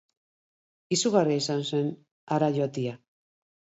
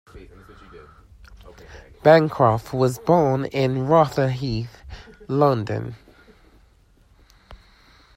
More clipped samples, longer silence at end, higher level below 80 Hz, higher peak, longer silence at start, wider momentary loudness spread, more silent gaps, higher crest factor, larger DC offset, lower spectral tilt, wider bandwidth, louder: neither; first, 0.85 s vs 0.6 s; second, -76 dBFS vs -48 dBFS; second, -8 dBFS vs -2 dBFS; first, 0.9 s vs 0.15 s; second, 10 LU vs 20 LU; first, 2.11-2.27 s vs none; about the same, 20 dB vs 22 dB; neither; second, -5 dB/octave vs -7.5 dB/octave; second, 8 kHz vs 16 kHz; second, -27 LUFS vs -20 LUFS